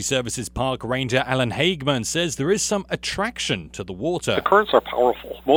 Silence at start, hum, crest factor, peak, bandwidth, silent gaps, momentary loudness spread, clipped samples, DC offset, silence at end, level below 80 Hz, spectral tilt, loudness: 0 s; none; 20 dB; -2 dBFS; over 20 kHz; none; 8 LU; under 0.1%; under 0.1%; 0 s; -46 dBFS; -4 dB/octave; -22 LUFS